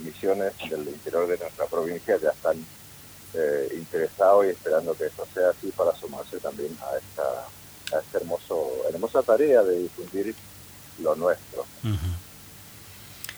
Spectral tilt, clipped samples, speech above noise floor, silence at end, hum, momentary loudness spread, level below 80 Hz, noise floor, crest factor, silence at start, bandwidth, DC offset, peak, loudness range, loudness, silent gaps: -5.5 dB/octave; under 0.1%; 20 dB; 0 s; none; 22 LU; -54 dBFS; -46 dBFS; 18 dB; 0 s; over 20 kHz; under 0.1%; -8 dBFS; 5 LU; -26 LUFS; none